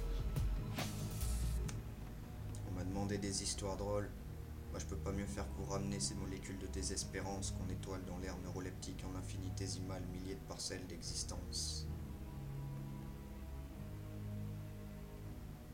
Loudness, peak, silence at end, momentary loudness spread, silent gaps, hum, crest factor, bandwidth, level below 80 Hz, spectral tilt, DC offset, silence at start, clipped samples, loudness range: -44 LUFS; -26 dBFS; 0 s; 10 LU; none; none; 18 dB; 16.5 kHz; -48 dBFS; -4.5 dB/octave; under 0.1%; 0 s; under 0.1%; 4 LU